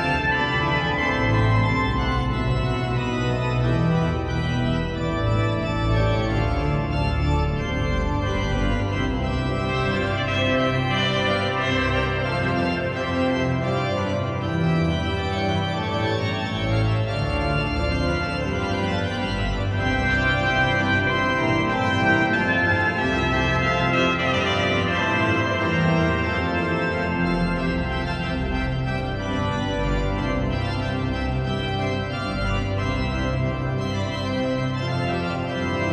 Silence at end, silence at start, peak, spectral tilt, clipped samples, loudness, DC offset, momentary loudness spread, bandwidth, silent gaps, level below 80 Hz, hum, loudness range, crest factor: 0 s; 0 s; -6 dBFS; -6.5 dB/octave; under 0.1%; -23 LUFS; under 0.1%; 5 LU; 9.8 kHz; none; -32 dBFS; none; 5 LU; 16 dB